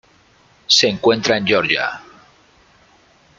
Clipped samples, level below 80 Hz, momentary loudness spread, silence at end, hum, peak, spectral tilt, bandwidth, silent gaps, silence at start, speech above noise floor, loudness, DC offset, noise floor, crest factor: under 0.1%; -58 dBFS; 16 LU; 1.35 s; none; 0 dBFS; -2.5 dB/octave; 9.4 kHz; none; 0.7 s; 37 dB; -15 LUFS; under 0.1%; -53 dBFS; 20 dB